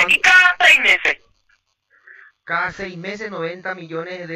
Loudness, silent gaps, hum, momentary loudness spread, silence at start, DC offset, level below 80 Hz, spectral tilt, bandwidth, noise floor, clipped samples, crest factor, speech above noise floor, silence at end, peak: -13 LUFS; none; none; 19 LU; 0 s; under 0.1%; -56 dBFS; -1.5 dB/octave; 16 kHz; -63 dBFS; under 0.1%; 18 dB; 37 dB; 0 s; -2 dBFS